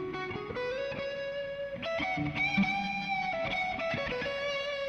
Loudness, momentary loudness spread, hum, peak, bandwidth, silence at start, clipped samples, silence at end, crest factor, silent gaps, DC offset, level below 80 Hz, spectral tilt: -33 LUFS; 8 LU; none; -18 dBFS; 10 kHz; 0 s; under 0.1%; 0 s; 16 dB; none; under 0.1%; -58 dBFS; -5.5 dB/octave